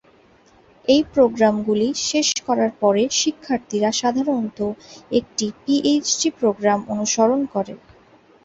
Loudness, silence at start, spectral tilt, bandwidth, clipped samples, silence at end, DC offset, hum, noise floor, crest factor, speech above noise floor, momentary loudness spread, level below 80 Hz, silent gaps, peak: -20 LUFS; 0.9 s; -3.5 dB/octave; 8 kHz; under 0.1%; 0.7 s; under 0.1%; none; -53 dBFS; 16 dB; 34 dB; 8 LU; -56 dBFS; none; -4 dBFS